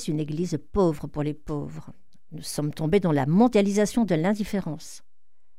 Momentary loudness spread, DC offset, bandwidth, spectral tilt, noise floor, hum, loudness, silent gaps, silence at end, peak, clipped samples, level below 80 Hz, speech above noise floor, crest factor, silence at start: 18 LU; 0.9%; 16 kHz; -6.5 dB/octave; -78 dBFS; none; -25 LUFS; none; 0.6 s; -8 dBFS; under 0.1%; -48 dBFS; 53 dB; 18 dB; 0 s